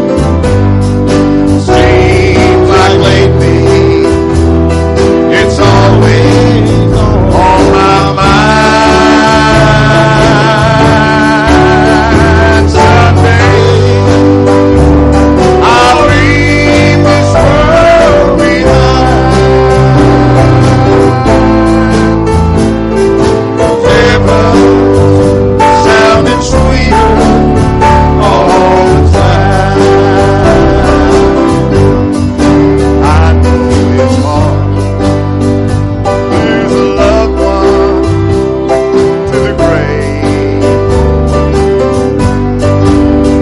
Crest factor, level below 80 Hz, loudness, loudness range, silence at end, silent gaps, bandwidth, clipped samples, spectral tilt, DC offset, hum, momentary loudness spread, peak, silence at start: 6 dB; -16 dBFS; -6 LUFS; 4 LU; 0 s; none; 11.5 kHz; 0.7%; -6.5 dB/octave; under 0.1%; none; 4 LU; 0 dBFS; 0 s